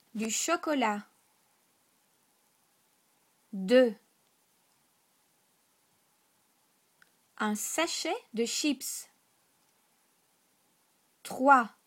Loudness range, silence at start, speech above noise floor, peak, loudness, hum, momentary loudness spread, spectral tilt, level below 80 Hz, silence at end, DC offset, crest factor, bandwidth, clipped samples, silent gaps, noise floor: 4 LU; 0.15 s; 42 dB; -8 dBFS; -29 LUFS; none; 19 LU; -3 dB/octave; -84 dBFS; 0.2 s; under 0.1%; 26 dB; 16.5 kHz; under 0.1%; none; -71 dBFS